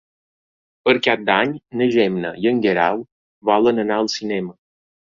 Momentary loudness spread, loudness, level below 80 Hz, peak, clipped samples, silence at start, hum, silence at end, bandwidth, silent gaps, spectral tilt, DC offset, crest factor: 9 LU; -19 LUFS; -60 dBFS; -2 dBFS; under 0.1%; 0.85 s; none; 0.6 s; 7.6 kHz; 3.12-3.41 s; -5 dB/octave; under 0.1%; 18 dB